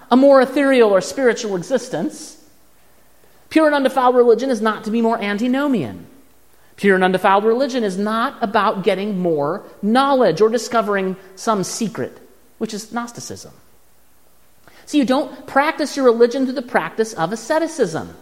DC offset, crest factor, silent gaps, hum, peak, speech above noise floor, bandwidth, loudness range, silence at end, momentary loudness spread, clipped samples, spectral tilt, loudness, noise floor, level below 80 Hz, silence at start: 0.3%; 18 dB; none; none; 0 dBFS; 39 dB; 16 kHz; 7 LU; 0.05 s; 13 LU; under 0.1%; -5 dB/octave; -17 LUFS; -56 dBFS; -62 dBFS; 0.1 s